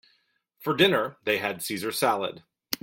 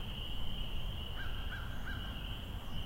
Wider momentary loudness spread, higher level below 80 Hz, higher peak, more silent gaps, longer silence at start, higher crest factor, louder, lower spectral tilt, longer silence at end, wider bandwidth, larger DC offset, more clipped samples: first, 13 LU vs 1 LU; second, -66 dBFS vs -42 dBFS; first, -2 dBFS vs -26 dBFS; neither; first, 0.6 s vs 0 s; first, 26 dB vs 12 dB; first, -26 LUFS vs -43 LUFS; second, -3.5 dB/octave vs -5 dB/octave; about the same, 0.05 s vs 0 s; about the same, 17 kHz vs 16 kHz; neither; neither